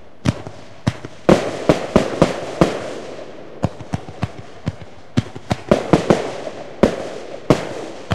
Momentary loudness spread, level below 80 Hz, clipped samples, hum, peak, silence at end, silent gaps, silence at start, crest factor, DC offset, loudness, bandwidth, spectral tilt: 16 LU; -38 dBFS; under 0.1%; none; 0 dBFS; 0 s; none; 0.25 s; 20 dB; 2%; -20 LUFS; 14 kHz; -6.5 dB/octave